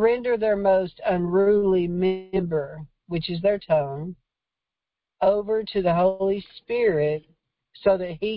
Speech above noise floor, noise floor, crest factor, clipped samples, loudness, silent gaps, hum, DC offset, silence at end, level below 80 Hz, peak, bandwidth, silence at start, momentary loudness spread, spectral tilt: 66 dB; -88 dBFS; 14 dB; under 0.1%; -23 LUFS; none; none; under 0.1%; 0 s; -52 dBFS; -10 dBFS; 5.4 kHz; 0 s; 10 LU; -11.5 dB/octave